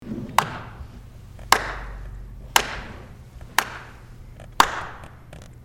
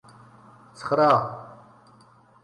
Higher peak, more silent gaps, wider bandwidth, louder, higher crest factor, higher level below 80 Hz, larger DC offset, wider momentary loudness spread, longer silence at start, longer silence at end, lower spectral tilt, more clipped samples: first, 0 dBFS vs -8 dBFS; neither; first, 16.5 kHz vs 11 kHz; about the same, -23 LUFS vs -22 LUFS; first, 28 dB vs 20 dB; first, -42 dBFS vs -68 dBFS; neither; about the same, 23 LU vs 22 LU; second, 0 s vs 0.8 s; second, 0 s vs 0.9 s; second, -2 dB/octave vs -6.5 dB/octave; neither